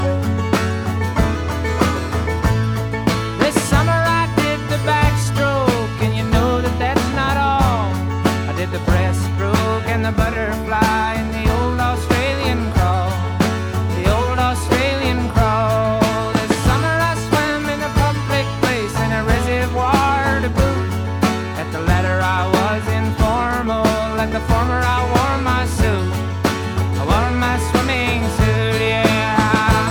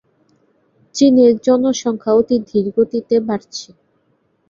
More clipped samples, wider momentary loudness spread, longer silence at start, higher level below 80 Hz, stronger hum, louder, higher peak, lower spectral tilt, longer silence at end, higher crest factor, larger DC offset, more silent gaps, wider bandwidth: neither; second, 4 LU vs 13 LU; second, 0 s vs 0.95 s; first, -26 dBFS vs -56 dBFS; neither; second, -18 LUFS vs -15 LUFS; about the same, 0 dBFS vs -2 dBFS; about the same, -5.5 dB/octave vs -5.5 dB/octave; second, 0 s vs 0.85 s; about the same, 16 dB vs 14 dB; neither; neither; first, 19.5 kHz vs 7.6 kHz